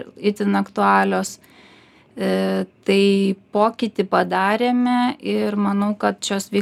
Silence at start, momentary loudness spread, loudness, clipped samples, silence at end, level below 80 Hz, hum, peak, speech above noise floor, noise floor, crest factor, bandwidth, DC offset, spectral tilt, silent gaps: 0 s; 7 LU; -20 LUFS; under 0.1%; 0 s; -64 dBFS; none; -2 dBFS; 31 dB; -50 dBFS; 18 dB; 14 kHz; under 0.1%; -5.5 dB/octave; none